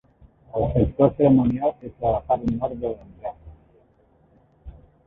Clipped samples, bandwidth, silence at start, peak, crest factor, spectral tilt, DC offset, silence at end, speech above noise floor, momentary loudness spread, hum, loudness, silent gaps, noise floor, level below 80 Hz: under 0.1%; 3.9 kHz; 0.55 s; -2 dBFS; 22 dB; -11.5 dB/octave; under 0.1%; 0.35 s; 38 dB; 17 LU; none; -22 LUFS; none; -59 dBFS; -40 dBFS